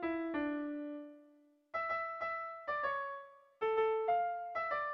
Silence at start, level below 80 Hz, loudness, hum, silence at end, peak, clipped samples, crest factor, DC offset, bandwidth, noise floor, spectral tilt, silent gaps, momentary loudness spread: 0 s; -74 dBFS; -38 LUFS; none; 0 s; -24 dBFS; under 0.1%; 14 dB; under 0.1%; 5.8 kHz; -66 dBFS; -2 dB/octave; none; 13 LU